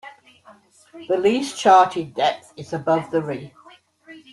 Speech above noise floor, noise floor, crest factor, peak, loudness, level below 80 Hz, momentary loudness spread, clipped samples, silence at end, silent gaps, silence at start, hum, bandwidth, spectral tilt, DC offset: 31 dB; -51 dBFS; 18 dB; -2 dBFS; -20 LUFS; -66 dBFS; 18 LU; under 0.1%; 0.15 s; none; 0.05 s; none; 12 kHz; -4.5 dB/octave; under 0.1%